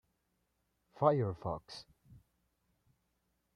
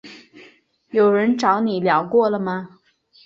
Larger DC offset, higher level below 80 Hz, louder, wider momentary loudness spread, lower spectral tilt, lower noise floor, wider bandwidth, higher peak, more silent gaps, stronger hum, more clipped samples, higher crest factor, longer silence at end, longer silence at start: neither; about the same, -68 dBFS vs -66 dBFS; second, -35 LUFS vs -19 LUFS; first, 20 LU vs 8 LU; first, -8 dB/octave vs -6.5 dB/octave; first, -81 dBFS vs -52 dBFS; first, 10.5 kHz vs 7.8 kHz; second, -14 dBFS vs -4 dBFS; neither; neither; neither; first, 26 dB vs 16 dB; first, 1.75 s vs 0.6 s; first, 1 s vs 0.05 s